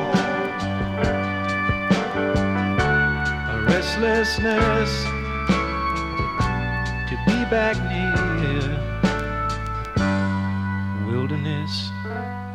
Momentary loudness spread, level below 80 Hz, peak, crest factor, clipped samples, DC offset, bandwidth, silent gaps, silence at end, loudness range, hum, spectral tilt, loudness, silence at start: 6 LU; -34 dBFS; -6 dBFS; 16 dB; under 0.1%; under 0.1%; 13 kHz; none; 0 s; 3 LU; none; -6 dB/octave; -22 LUFS; 0 s